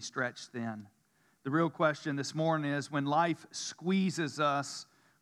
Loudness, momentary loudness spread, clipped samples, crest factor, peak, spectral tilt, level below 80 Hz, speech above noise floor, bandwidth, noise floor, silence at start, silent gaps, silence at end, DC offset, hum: -33 LUFS; 11 LU; under 0.1%; 20 dB; -14 dBFS; -5 dB/octave; under -90 dBFS; 30 dB; 12.5 kHz; -63 dBFS; 0 s; none; 0.4 s; under 0.1%; none